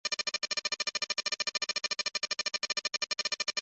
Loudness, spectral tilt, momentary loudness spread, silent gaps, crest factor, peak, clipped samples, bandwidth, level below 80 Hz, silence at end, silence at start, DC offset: -31 LUFS; 2 dB/octave; 1 LU; none; 16 dB; -20 dBFS; under 0.1%; 8.4 kHz; -78 dBFS; 0 s; 0.05 s; under 0.1%